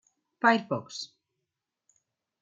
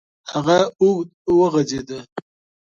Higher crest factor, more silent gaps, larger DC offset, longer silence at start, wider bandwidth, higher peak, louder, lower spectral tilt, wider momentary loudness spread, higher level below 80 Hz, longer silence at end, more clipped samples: first, 26 dB vs 16 dB; second, none vs 1.14-1.25 s, 2.12-2.16 s; neither; first, 0.45 s vs 0.25 s; about the same, 7.8 kHz vs 7.4 kHz; second, -6 dBFS vs -2 dBFS; second, -27 LUFS vs -19 LUFS; about the same, -4.5 dB/octave vs -5.5 dB/octave; about the same, 16 LU vs 16 LU; second, -86 dBFS vs -54 dBFS; first, 1.35 s vs 0.4 s; neither